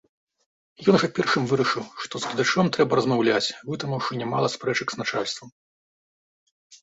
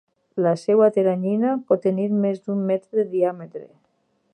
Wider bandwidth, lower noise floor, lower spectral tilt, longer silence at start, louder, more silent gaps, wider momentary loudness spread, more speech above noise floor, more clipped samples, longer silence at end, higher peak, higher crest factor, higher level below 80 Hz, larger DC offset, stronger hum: second, 8 kHz vs 9.4 kHz; first, under -90 dBFS vs -68 dBFS; second, -5 dB/octave vs -9 dB/octave; first, 0.8 s vs 0.35 s; second, -24 LUFS vs -21 LUFS; first, 5.52-6.70 s vs none; second, 9 LU vs 12 LU; first, over 66 dB vs 47 dB; neither; second, 0.05 s vs 0.65 s; about the same, -4 dBFS vs -6 dBFS; about the same, 20 dB vs 16 dB; first, -64 dBFS vs -76 dBFS; neither; neither